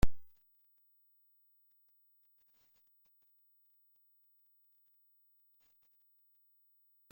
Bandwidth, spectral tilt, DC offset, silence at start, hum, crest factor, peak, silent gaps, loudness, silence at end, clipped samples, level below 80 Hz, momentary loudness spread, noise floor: 16.5 kHz; -6.5 dB/octave; under 0.1%; 0.05 s; 50 Hz at -120 dBFS; 26 dB; -14 dBFS; none; -59 LUFS; 6.9 s; under 0.1%; -50 dBFS; 0 LU; -71 dBFS